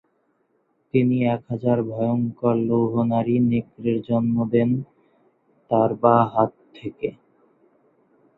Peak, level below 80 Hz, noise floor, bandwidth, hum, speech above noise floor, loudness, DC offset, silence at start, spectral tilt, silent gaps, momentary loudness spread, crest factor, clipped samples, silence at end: -2 dBFS; -60 dBFS; -67 dBFS; 4.1 kHz; none; 47 dB; -22 LUFS; under 0.1%; 0.95 s; -11.5 dB/octave; none; 12 LU; 20 dB; under 0.1%; 1.25 s